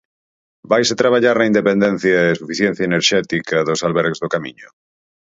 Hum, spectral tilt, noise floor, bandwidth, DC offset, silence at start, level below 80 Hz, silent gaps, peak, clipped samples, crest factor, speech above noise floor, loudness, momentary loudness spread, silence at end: none; -4.5 dB/octave; under -90 dBFS; 7.8 kHz; under 0.1%; 0.7 s; -56 dBFS; none; 0 dBFS; under 0.1%; 18 dB; over 74 dB; -16 LUFS; 5 LU; 0.65 s